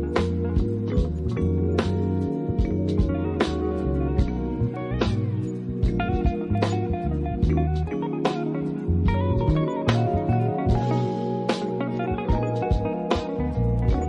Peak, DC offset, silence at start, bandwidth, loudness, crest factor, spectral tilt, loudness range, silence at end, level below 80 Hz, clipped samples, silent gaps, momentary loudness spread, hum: -6 dBFS; under 0.1%; 0 s; 10 kHz; -25 LUFS; 18 dB; -8 dB/octave; 2 LU; 0 s; -32 dBFS; under 0.1%; none; 4 LU; none